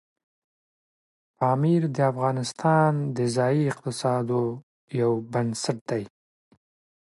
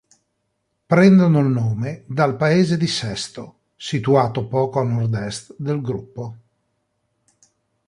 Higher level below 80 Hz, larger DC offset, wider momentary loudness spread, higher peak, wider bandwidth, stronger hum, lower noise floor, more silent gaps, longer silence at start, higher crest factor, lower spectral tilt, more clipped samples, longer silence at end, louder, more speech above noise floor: second, -68 dBFS vs -54 dBFS; neither; second, 10 LU vs 17 LU; second, -8 dBFS vs -2 dBFS; about the same, 11.5 kHz vs 11.5 kHz; neither; first, under -90 dBFS vs -72 dBFS; first, 4.63-4.88 s, 5.81-5.86 s vs none; first, 1.4 s vs 0.9 s; about the same, 18 dB vs 18 dB; about the same, -6.5 dB/octave vs -6.5 dB/octave; neither; second, 0.95 s vs 1.55 s; second, -25 LUFS vs -19 LUFS; first, over 66 dB vs 54 dB